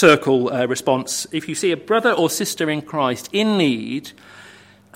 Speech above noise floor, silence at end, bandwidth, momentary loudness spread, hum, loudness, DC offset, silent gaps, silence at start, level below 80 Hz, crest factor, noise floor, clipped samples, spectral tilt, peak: 27 dB; 0.45 s; 16.5 kHz; 8 LU; 50 Hz at -50 dBFS; -19 LUFS; under 0.1%; none; 0 s; -64 dBFS; 20 dB; -46 dBFS; under 0.1%; -4 dB/octave; 0 dBFS